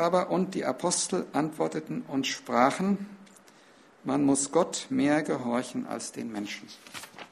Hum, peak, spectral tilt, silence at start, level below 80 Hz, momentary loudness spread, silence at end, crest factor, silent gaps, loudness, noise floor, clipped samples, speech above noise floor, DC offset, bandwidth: none; -6 dBFS; -4 dB/octave; 0 s; -70 dBFS; 15 LU; 0.05 s; 22 dB; none; -28 LUFS; -57 dBFS; under 0.1%; 28 dB; under 0.1%; 14 kHz